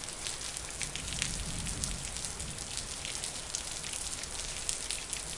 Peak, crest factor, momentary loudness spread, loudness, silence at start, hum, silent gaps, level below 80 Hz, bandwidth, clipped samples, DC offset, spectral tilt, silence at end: -8 dBFS; 30 dB; 3 LU; -36 LUFS; 0 s; none; none; -48 dBFS; 11.5 kHz; under 0.1%; under 0.1%; -1.5 dB/octave; 0 s